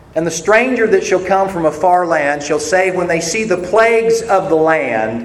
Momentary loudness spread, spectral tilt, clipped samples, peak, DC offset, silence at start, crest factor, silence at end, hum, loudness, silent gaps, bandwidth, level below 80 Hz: 5 LU; -4 dB/octave; under 0.1%; 0 dBFS; under 0.1%; 0.15 s; 14 dB; 0 s; none; -14 LUFS; none; 14 kHz; -46 dBFS